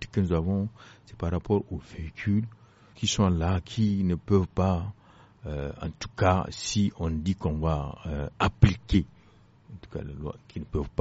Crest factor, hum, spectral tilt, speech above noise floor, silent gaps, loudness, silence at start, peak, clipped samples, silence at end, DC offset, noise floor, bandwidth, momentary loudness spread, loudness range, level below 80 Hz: 22 dB; none; -6.5 dB/octave; 30 dB; none; -28 LUFS; 0 s; -6 dBFS; under 0.1%; 0.1 s; under 0.1%; -57 dBFS; 8 kHz; 14 LU; 2 LU; -40 dBFS